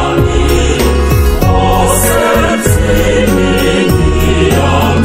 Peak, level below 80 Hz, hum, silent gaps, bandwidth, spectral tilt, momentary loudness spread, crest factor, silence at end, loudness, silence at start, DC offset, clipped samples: 0 dBFS; -14 dBFS; none; none; 16.5 kHz; -5 dB/octave; 2 LU; 8 dB; 0 s; -10 LUFS; 0 s; 0.6%; 0.3%